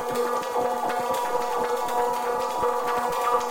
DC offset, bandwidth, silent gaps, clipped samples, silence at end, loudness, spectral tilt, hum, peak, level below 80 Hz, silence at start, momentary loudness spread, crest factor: under 0.1%; 17 kHz; none; under 0.1%; 0 s; -26 LUFS; -3 dB/octave; none; -10 dBFS; -58 dBFS; 0 s; 2 LU; 16 dB